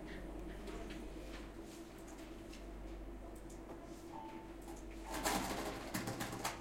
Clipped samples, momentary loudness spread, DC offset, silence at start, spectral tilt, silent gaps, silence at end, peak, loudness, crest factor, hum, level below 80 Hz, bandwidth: under 0.1%; 13 LU; under 0.1%; 0 s; -3.5 dB/octave; none; 0 s; -24 dBFS; -46 LUFS; 22 dB; none; -54 dBFS; 16.5 kHz